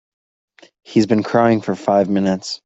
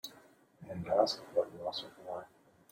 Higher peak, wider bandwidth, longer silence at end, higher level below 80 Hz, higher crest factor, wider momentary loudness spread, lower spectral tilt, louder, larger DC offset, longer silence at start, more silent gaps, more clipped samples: first, -2 dBFS vs -14 dBFS; second, 8 kHz vs 16.5 kHz; second, 0.1 s vs 0.45 s; first, -58 dBFS vs -74 dBFS; second, 16 dB vs 24 dB; second, 4 LU vs 16 LU; first, -6.5 dB/octave vs -4.5 dB/octave; first, -17 LUFS vs -36 LUFS; neither; first, 0.9 s vs 0.05 s; neither; neither